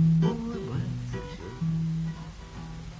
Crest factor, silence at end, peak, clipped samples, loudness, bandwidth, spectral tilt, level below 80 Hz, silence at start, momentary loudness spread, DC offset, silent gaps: 14 dB; 0 s; -14 dBFS; under 0.1%; -31 LUFS; 7.8 kHz; -8.5 dB/octave; -46 dBFS; 0 s; 15 LU; under 0.1%; none